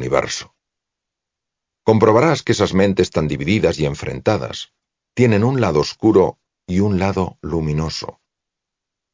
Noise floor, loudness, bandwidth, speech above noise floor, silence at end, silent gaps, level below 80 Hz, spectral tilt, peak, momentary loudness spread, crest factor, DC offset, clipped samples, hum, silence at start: -83 dBFS; -18 LUFS; 7.6 kHz; 66 dB; 1.05 s; none; -40 dBFS; -6 dB/octave; 0 dBFS; 12 LU; 18 dB; under 0.1%; under 0.1%; none; 0 s